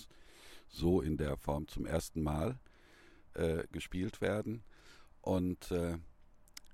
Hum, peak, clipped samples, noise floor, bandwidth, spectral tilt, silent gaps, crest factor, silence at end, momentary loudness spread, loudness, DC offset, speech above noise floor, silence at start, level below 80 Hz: none; -20 dBFS; under 0.1%; -61 dBFS; 16.5 kHz; -6.5 dB/octave; none; 18 dB; 0 s; 20 LU; -37 LUFS; under 0.1%; 25 dB; 0 s; -50 dBFS